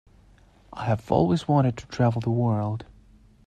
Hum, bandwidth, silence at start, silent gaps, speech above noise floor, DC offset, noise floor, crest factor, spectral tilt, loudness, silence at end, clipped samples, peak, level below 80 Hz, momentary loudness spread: none; 9.2 kHz; 0.75 s; none; 32 dB; under 0.1%; -55 dBFS; 20 dB; -8.5 dB/octave; -25 LUFS; 0.65 s; under 0.1%; -6 dBFS; -52 dBFS; 11 LU